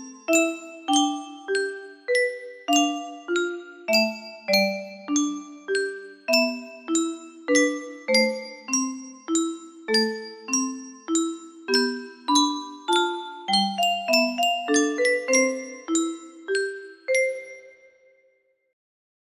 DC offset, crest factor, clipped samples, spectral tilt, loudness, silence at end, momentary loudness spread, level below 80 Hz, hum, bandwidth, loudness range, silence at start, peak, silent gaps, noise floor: under 0.1%; 18 dB; under 0.1%; -2 dB/octave; -24 LUFS; 1.6 s; 13 LU; -74 dBFS; none; 15.5 kHz; 4 LU; 0 s; -6 dBFS; none; -66 dBFS